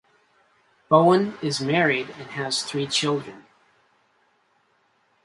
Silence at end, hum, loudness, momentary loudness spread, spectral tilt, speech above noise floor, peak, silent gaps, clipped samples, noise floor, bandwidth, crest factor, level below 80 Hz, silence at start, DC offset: 1.85 s; none; -22 LUFS; 13 LU; -4.5 dB/octave; 44 dB; -4 dBFS; none; under 0.1%; -66 dBFS; 11.5 kHz; 20 dB; -68 dBFS; 0.9 s; under 0.1%